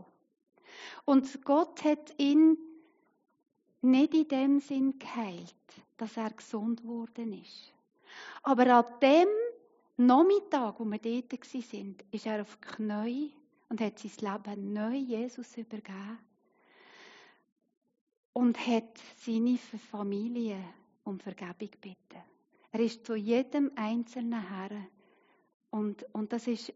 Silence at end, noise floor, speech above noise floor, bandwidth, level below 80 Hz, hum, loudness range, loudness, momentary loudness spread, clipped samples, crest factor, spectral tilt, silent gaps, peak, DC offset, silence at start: 0.05 s; -67 dBFS; 37 dB; 7.6 kHz; -88 dBFS; none; 12 LU; -31 LUFS; 20 LU; under 0.1%; 20 dB; -4.5 dB/octave; 17.52-17.56 s, 17.77-17.81 s, 18.01-18.07 s, 18.17-18.33 s, 25.54-25.60 s; -12 dBFS; under 0.1%; 0.7 s